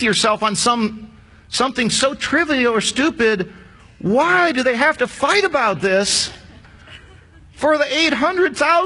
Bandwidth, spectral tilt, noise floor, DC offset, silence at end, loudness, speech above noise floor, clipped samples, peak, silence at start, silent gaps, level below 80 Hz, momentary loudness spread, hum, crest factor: 11 kHz; -3 dB/octave; -44 dBFS; under 0.1%; 0 s; -17 LUFS; 28 dB; under 0.1%; -2 dBFS; 0 s; none; -48 dBFS; 7 LU; none; 16 dB